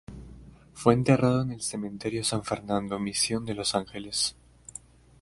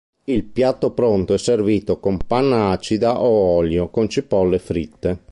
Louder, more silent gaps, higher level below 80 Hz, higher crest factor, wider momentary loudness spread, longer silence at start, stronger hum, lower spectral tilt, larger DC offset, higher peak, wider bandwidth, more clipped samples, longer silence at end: second, -27 LUFS vs -19 LUFS; neither; second, -54 dBFS vs -40 dBFS; first, 24 dB vs 14 dB; first, 21 LU vs 7 LU; second, 0.1 s vs 0.3 s; neither; second, -4.5 dB/octave vs -6.5 dB/octave; neither; about the same, -4 dBFS vs -4 dBFS; about the same, 11.5 kHz vs 11.5 kHz; neither; first, 0.45 s vs 0.15 s